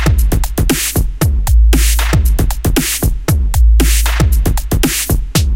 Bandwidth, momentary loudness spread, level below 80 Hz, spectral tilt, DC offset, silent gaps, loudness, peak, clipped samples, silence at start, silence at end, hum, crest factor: 17 kHz; 4 LU; -12 dBFS; -4.5 dB/octave; under 0.1%; none; -13 LUFS; 0 dBFS; under 0.1%; 0 s; 0 s; none; 10 dB